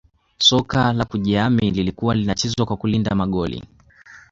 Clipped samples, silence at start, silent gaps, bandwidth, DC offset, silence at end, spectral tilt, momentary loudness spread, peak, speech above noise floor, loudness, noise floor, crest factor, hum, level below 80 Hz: under 0.1%; 0.4 s; none; 7.8 kHz; under 0.1%; 0.1 s; -5 dB/octave; 7 LU; -2 dBFS; 27 dB; -19 LUFS; -46 dBFS; 18 dB; none; -42 dBFS